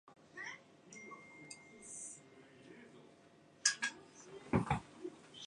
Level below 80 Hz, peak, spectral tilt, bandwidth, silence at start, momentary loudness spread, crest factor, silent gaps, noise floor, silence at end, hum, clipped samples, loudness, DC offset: -64 dBFS; -14 dBFS; -3 dB/octave; 11 kHz; 0.05 s; 24 LU; 32 dB; none; -65 dBFS; 0 s; none; under 0.1%; -40 LUFS; under 0.1%